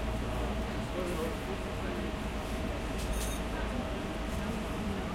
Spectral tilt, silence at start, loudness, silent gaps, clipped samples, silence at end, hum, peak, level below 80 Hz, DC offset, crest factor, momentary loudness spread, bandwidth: -5.5 dB/octave; 0 s; -36 LUFS; none; under 0.1%; 0 s; none; -22 dBFS; -40 dBFS; under 0.1%; 12 dB; 2 LU; 16.5 kHz